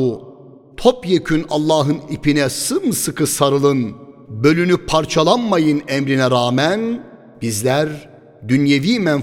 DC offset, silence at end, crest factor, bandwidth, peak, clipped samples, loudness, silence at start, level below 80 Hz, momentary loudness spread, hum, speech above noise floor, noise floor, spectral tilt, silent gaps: under 0.1%; 0 s; 16 dB; 17 kHz; 0 dBFS; under 0.1%; -17 LUFS; 0 s; -44 dBFS; 9 LU; none; 25 dB; -41 dBFS; -5 dB/octave; none